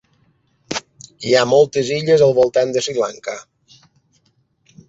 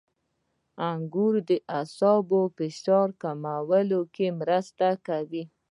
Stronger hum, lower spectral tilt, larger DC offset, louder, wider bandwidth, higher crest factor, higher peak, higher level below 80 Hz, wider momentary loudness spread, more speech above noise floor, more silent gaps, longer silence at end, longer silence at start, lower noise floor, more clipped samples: neither; second, -4.5 dB/octave vs -7.5 dB/octave; neither; first, -16 LUFS vs -26 LUFS; second, 8 kHz vs 11 kHz; about the same, 18 dB vs 18 dB; first, -2 dBFS vs -10 dBFS; first, -58 dBFS vs -80 dBFS; first, 16 LU vs 9 LU; about the same, 47 dB vs 50 dB; neither; first, 1.5 s vs 0.25 s; about the same, 0.7 s vs 0.8 s; second, -62 dBFS vs -76 dBFS; neither